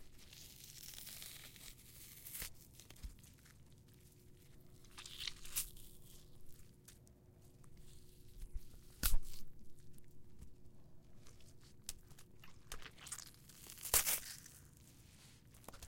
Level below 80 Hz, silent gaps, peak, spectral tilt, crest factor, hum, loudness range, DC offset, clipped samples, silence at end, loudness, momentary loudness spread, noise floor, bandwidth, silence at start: -52 dBFS; none; -14 dBFS; -1 dB/octave; 30 dB; none; 16 LU; under 0.1%; under 0.1%; 0 s; -44 LUFS; 24 LU; -64 dBFS; 17 kHz; 0 s